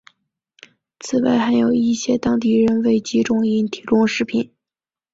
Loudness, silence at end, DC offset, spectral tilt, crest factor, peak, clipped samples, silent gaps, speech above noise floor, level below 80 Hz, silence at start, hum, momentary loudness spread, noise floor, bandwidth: -18 LUFS; 0.7 s; under 0.1%; -5.5 dB/octave; 14 dB; -4 dBFS; under 0.1%; none; over 73 dB; -54 dBFS; 1.05 s; none; 6 LU; under -90 dBFS; 7.8 kHz